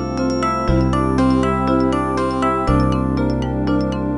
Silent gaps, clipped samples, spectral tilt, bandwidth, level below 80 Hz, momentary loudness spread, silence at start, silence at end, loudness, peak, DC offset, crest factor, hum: none; under 0.1%; -7.5 dB/octave; 11.5 kHz; -26 dBFS; 3 LU; 0 s; 0 s; -18 LUFS; -4 dBFS; under 0.1%; 14 dB; none